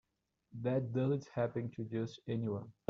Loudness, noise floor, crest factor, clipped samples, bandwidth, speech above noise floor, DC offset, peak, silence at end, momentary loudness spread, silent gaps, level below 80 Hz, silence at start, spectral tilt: -38 LUFS; -77 dBFS; 18 dB; under 0.1%; 7.2 kHz; 40 dB; under 0.1%; -20 dBFS; 0.2 s; 6 LU; none; -72 dBFS; 0.55 s; -8 dB/octave